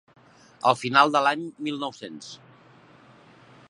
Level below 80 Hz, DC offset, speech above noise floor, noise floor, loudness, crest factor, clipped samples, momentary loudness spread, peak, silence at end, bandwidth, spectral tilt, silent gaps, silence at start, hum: -76 dBFS; under 0.1%; 29 dB; -53 dBFS; -23 LUFS; 24 dB; under 0.1%; 22 LU; -4 dBFS; 1.35 s; 11.5 kHz; -4 dB/octave; none; 0.65 s; none